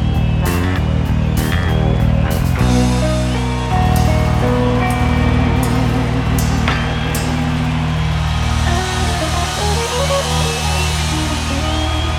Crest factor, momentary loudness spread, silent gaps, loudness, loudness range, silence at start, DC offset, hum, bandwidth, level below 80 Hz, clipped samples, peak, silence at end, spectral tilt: 12 dB; 3 LU; none; -16 LUFS; 2 LU; 0 s; under 0.1%; none; 17.5 kHz; -22 dBFS; under 0.1%; -2 dBFS; 0 s; -5.5 dB/octave